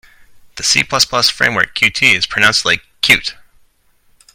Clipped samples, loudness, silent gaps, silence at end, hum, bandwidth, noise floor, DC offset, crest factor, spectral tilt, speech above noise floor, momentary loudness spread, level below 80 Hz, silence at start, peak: under 0.1%; -12 LUFS; none; 1.05 s; none; over 20 kHz; -54 dBFS; under 0.1%; 16 dB; -1 dB/octave; 40 dB; 4 LU; -46 dBFS; 0.55 s; 0 dBFS